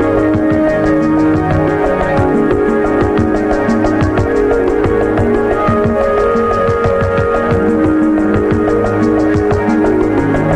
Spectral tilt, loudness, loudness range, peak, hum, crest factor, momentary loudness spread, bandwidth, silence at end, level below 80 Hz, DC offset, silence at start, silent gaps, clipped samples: -8.5 dB/octave; -12 LUFS; 0 LU; 0 dBFS; none; 10 dB; 1 LU; 9.4 kHz; 0 s; -28 dBFS; under 0.1%; 0 s; none; under 0.1%